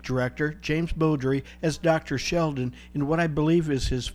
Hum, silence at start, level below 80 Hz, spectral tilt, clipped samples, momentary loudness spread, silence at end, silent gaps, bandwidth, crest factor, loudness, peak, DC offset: none; 0.05 s; -40 dBFS; -6 dB/octave; under 0.1%; 6 LU; 0 s; none; 14 kHz; 16 dB; -26 LUFS; -10 dBFS; under 0.1%